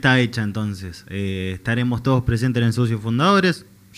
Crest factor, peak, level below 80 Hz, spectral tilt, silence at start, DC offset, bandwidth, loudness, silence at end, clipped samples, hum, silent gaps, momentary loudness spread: 18 dB; -2 dBFS; -44 dBFS; -6.5 dB/octave; 0 s; under 0.1%; 14 kHz; -20 LUFS; 0.35 s; under 0.1%; none; none; 11 LU